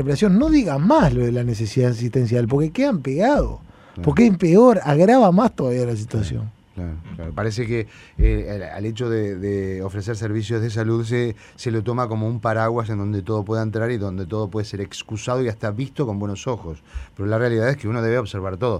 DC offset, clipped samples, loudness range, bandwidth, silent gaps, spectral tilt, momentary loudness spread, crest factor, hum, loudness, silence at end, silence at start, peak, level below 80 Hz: under 0.1%; under 0.1%; 9 LU; 11.5 kHz; none; -7.5 dB/octave; 14 LU; 18 dB; none; -20 LUFS; 0 s; 0 s; -2 dBFS; -34 dBFS